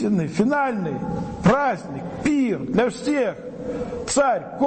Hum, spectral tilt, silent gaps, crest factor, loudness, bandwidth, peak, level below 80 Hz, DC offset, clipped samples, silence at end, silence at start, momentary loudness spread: none; -6 dB/octave; none; 16 dB; -22 LUFS; 8.8 kHz; -6 dBFS; -48 dBFS; under 0.1%; under 0.1%; 0 s; 0 s; 10 LU